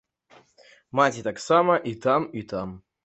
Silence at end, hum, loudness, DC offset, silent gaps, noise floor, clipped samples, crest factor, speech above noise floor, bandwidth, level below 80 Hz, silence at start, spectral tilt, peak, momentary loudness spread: 0.25 s; none; -24 LUFS; under 0.1%; none; -57 dBFS; under 0.1%; 20 dB; 33 dB; 8.2 kHz; -60 dBFS; 0.95 s; -5.5 dB/octave; -4 dBFS; 13 LU